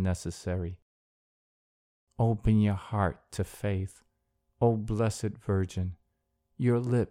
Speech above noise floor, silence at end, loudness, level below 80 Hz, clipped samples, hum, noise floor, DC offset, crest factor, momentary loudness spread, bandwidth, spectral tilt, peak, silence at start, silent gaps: 49 dB; 0.05 s; -30 LUFS; -48 dBFS; under 0.1%; none; -78 dBFS; under 0.1%; 18 dB; 11 LU; 13.5 kHz; -7.5 dB/octave; -12 dBFS; 0 s; 0.82-2.07 s